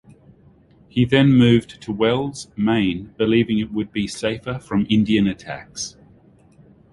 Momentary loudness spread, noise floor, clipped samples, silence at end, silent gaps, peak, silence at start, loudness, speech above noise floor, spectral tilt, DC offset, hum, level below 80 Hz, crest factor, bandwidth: 15 LU; -52 dBFS; under 0.1%; 1.05 s; none; -2 dBFS; 0.95 s; -20 LUFS; 33 dB; -6 dB/octave; under 0.1%; none; -48 dBFS; 18 dB; 11.5 kHz